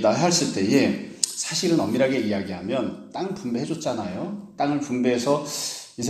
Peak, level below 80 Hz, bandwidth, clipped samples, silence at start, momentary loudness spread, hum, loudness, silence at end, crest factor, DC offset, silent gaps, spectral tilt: 0 dBFS; -62 dBFS; 15 kHz; under 0.1%; 0 s; 10 LU; none; -24 LUFS; 0 s; 24 dB; under 0.1%; none; -4 dB/octave